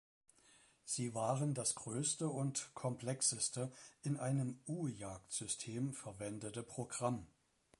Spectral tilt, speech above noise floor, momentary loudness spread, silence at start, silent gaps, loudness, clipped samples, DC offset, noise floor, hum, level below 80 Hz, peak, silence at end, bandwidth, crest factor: -4.5 dB/octave; 28 dB; 10 LU; 0.85 s; none; -41 LUFS; under 0.1%; under 0.1%; -69 dBFS; none; -74 dBFS; -22 dBFS; 0.55 s; 11.5 kHz; 20 dB